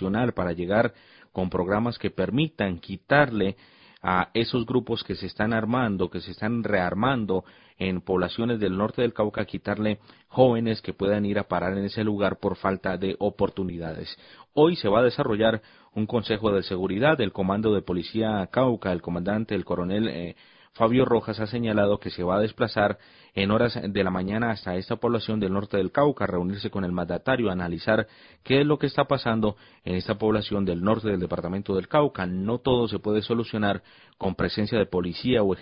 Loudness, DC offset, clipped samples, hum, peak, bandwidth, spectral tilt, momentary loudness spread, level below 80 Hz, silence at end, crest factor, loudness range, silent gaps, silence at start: -25 LUFS; under 0.1%; under 0.1%; none; -4 dBFS; 5.4 kHz; -11 dB/octave; 8 LU; -48 dBFS; 0 s; 22 dB; 2 LU; none; 0 s